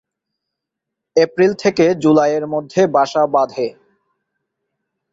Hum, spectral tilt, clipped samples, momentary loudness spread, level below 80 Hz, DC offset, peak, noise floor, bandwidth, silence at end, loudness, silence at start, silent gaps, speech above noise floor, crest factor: none; -6 dB/octave; under 0.1%; 7 LU; -62 dBFS; under 0.1%; -2 dBFS; -81 dBFS; 7.8 kHz; 1.4 s; -16 LUFS; 1.15 s; none; 66 dB; 16 dB